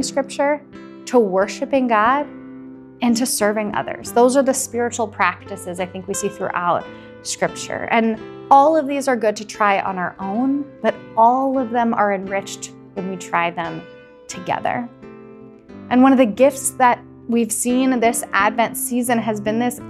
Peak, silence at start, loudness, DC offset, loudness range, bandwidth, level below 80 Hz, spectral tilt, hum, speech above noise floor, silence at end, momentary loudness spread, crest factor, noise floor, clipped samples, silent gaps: 0 dBFS; 0 s; -19 LUFS; under 0.1%; 5 LU; 14.5 kHz; -58 dBFS; -4 dB/octave; none; 22 dB; 0 s; 15 LU; 18 dB; -41 dBFS; under 0.1%; none